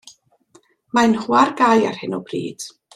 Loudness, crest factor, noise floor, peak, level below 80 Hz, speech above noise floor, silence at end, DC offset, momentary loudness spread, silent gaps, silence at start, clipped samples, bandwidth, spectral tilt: -18 LUFS; 18 dB; -55 dBFS; -2 dBFS; -62 dBFS; 37 dB; 0.25 s; under 0.1%; 13 LU; none; 0.95 s; under 0.1%; 12.5 kHz; -4.5 dB/octave